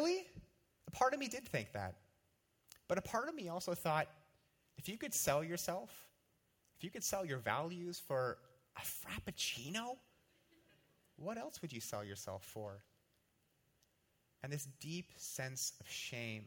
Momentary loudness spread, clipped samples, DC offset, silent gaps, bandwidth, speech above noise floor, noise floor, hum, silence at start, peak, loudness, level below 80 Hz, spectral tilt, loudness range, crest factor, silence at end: 16 LU; under 0.1%; under 0.1%; none; 19.5 kHz; 37 dB; -79 dBFS; none; 0 s; -20 dBFS; -42 LUFS; -72 dBFS; -3.5 dB/octave; 9 LU; 24 dB; 0 s